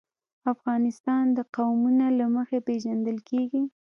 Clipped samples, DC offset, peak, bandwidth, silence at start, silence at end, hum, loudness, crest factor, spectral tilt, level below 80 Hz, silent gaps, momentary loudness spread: under 0.1%; under 0.1%; -12 dBFS; 6.8 kHz; 0.45 s; 0.2 s; none; -26 LUFS; 14 dB; -7 dB/octave; -78 dBFS; 1.00-1.04 s, 1.49-1.53 s; 7 LU